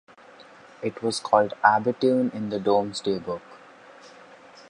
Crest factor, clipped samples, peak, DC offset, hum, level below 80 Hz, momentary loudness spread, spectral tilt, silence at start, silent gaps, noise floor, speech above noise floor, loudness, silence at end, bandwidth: 24 dB; under 0.1%; -2 dBFS; under 0.1%; none; -66 dBFS; 13 LU; -5 dB/octave; 0.8 s; none; -49 dBFS; 26 dB; -24 LUFS; 0.1 s; 11 kHz